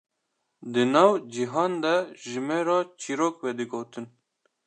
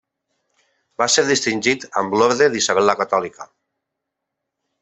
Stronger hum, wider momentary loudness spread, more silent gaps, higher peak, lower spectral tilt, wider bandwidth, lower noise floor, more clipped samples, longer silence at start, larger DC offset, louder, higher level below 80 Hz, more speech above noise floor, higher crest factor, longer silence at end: neither; first, 16 LU vs 7 LU; neither; second, -4 dBFS vs 0 dBFS; first, -5 dB/octave vs -2.5 dB/octave; first, 9.8 kHz vs 8.4 kHz; about the same, -78 dBFS vs -80 dBFS; neither; second, 0.6 s vs 1 s; neither; second, -26 LUFS vs -17 LUFS; second, -82 dBFS vs -62 dBFS; second, 53 dB vs 62 dB; about the same, 22 dB vs 20 dB; second, 0.6 s vs 1.35 s